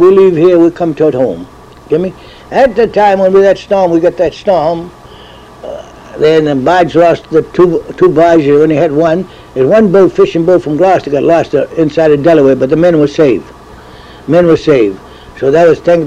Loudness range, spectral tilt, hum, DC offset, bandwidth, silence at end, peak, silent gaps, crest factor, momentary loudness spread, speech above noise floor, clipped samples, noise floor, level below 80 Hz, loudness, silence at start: 3 LU; -7.5 dB/octave; none; 0.1%; 9.2 kHz; 0 s; 0 dBFS; none; 8 dB; 10 LU; 25 dB; under 0.1%; -33 dBFS; -40 dBFS; -9 LUFS; 0 s